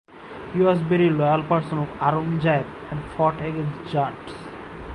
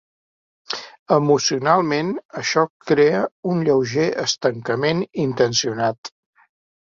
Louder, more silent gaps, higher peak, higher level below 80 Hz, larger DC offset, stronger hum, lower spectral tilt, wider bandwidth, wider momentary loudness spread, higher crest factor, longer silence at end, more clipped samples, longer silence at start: second, -23 LUFS vs -20 LUFS; second, none vs 0.99-1.06 s, 2.25-2.29 s, 2.70-2.80 s, 3.32-3.43 s, 5.98-6.03 s; second, -6 dBFS vs -2 dBFS; first, -50 dBFS vs -60 dBFS; neither; neither; first, -8.5 dB/octave vs -4.5 dB/octave; first, 10.5 kHz vs 7.6 kHz; first, 17 LU vs 11 LU; about the same, 18 dB vs 18 dB; second, 0 s vs 0.85 s; neither; second, 0.1 s vs 0.7 s